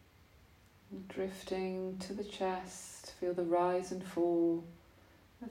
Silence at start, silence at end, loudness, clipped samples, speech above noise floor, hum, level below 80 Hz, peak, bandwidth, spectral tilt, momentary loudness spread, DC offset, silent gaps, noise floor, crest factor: 0.4 s; 0 s; -37 LUFS; under 0.1%; 27 dB; none; -68 dBFS; -22 dBFS; 15.5 kHz; -5.5 dB/octave; 16 LU; under 0.1%; none; -63 dBFS; 16 dB